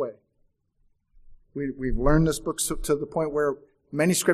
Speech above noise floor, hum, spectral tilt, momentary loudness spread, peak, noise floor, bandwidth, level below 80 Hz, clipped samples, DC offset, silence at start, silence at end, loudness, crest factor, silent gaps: 45 dB; none; -5 dB/octave; 12 LU; -6 dBFS; -68 dBFS; 15 kHz; -36 dBFS; under 0.1%; under 0.1%; 0 s; 0 s; -26 LUFS; 20 dB; none